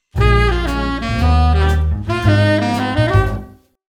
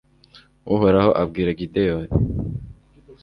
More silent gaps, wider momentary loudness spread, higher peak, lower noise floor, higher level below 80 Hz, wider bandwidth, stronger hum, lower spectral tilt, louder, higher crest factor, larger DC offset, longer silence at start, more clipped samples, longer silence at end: neither; second, 6 LU vs 14 LU; about the same, 0 dBFS vs -2 dBFS; second, -35 dBFS vs -52 dBFS; first, -20 dBFS vs -36 dBFS; first, 11.5 kHz vs 5.4 kHz; neither; second, -7 dB/octave vs -10 dB/octave; first, -16 LUFS vs -20 LUFS; about the same, 14 dB vs 18 dB; neither; second, 0.15 s vs 0.65 s; neither; first, 0.4 s vs 0.1 s